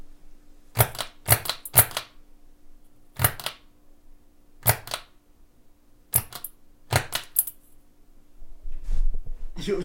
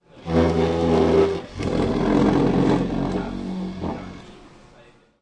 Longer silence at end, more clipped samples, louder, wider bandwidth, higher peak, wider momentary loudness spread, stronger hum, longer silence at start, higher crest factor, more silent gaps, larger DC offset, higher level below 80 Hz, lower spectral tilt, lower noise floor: second, 0 s vs 0.75 s; neither; second, -25 LUFS vs -21 LUFS; first, 17 kHz vs 10 kHz; about the same, -2 dBFS vs -4 dBFS; first, 21 LU vs 12 LU; neither; second, 0 s vs 0.15 s; first, 26 dB vs 18 dB; neither; neither; about the same, -36 dBFS vs -40 dBFS; second, -3 dB/octave vs -7.5 dB/octave; about the same, -54 dBFS vs -52 dBFS